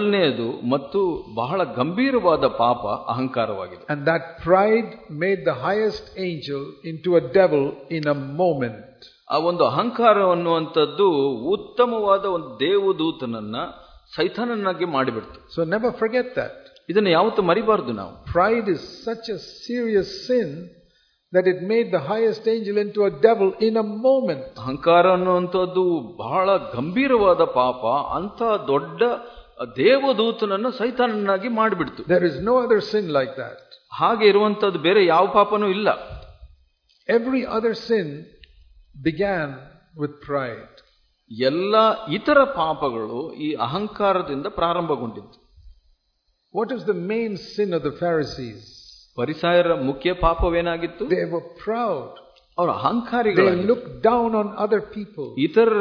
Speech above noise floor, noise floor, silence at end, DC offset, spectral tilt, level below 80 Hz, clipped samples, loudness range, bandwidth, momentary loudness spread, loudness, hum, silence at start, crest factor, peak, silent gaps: 48 dB; -69 dBFS; 0 s; under 0.1%; -7 dB/octave; -46 dBFS; under 0.1%; 6 LU; 5.4 kHz; 12 LU; -21 LUFS; none; 0 s; 20 dB; -2 dBFS; none